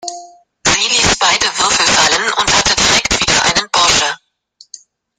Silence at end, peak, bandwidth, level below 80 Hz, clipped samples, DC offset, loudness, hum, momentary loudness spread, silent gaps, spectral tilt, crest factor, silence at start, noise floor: 1.05 s; 0 dBFS; 16.5 kHz; -36 dBFS; under 0.1%; under 0.1%; -11 LUFS; none; 5 LU; none; -0.5 dB/octave; 14 dB; 0.05 s; -48 dBFS